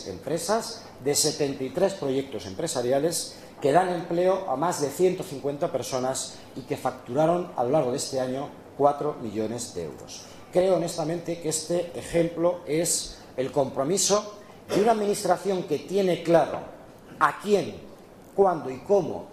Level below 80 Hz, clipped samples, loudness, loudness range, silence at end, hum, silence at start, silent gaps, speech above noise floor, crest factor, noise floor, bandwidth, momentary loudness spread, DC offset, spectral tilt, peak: -58 dBFS; under 0.1%; -26 LUFS; 3 LU; 0 s; none; 0 s; none; 22 dB; 22 dB; -47 dBFS; 14.5 kHz; 12 LU; under 0.1%; -4 dB/octave; -4 dBFS